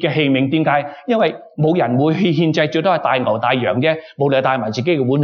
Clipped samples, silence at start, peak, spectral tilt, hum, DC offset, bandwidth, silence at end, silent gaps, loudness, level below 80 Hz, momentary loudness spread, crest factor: under 0.1%; 0 s; -2 dBFS; -7.5 dB/octave; none; under 0.1%; 7 kHz; 0 s; none; -17 LUFS; -64 dBFS; 4 LU; 14 dB